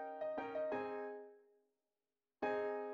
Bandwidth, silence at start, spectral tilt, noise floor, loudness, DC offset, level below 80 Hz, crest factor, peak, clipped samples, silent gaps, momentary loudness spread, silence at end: 7 kHz; 0 s; -6.5 dB/octave; under -90 dBFS; -43 LUFS; under 0.1%; -84 dBFS; 18 dB; -28 dBFS; under 0.1%; none; 11 LU; 0 s